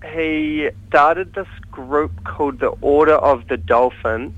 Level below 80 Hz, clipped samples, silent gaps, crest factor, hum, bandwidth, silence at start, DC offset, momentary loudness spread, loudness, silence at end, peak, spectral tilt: -40 dBFS; under 0.1%; none; 18 dB; none; 8 kHz; 0 s; under 0.1%; 12 LU; -17 LUFS; 0 s; 0 dBFS; -7.5 dB/octave